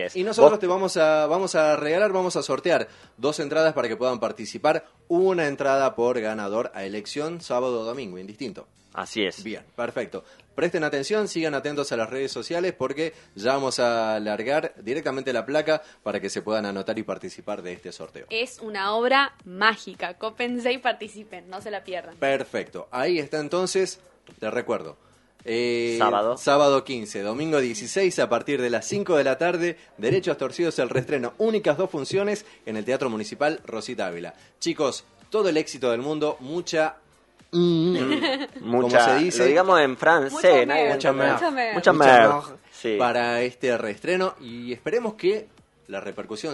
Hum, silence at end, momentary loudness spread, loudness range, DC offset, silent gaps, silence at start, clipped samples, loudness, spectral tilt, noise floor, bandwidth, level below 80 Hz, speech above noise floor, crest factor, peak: none; 0 s; 15 LU; 9 LU; under 0.1%; none; 0 s; under 0.1%; -24 LUFS; -4.5 dB/octave; -57 dBFS; 11.5 kHz; -66 dBFS; 33 dB; 24 dB; 0 dBFS